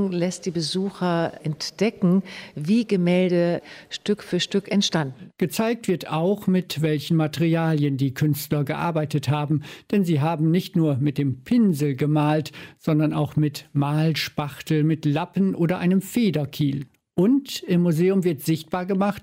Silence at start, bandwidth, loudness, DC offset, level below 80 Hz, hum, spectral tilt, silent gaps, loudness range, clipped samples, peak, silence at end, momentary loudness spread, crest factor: 0 s; 16 kHz; -23 LUFS; under 0.1%; -62 dBFS; none; -6.5 dB/octave; none; 1 LU; under 0.1%; -10 dBFS; 0 s; 6 LU; 12 dB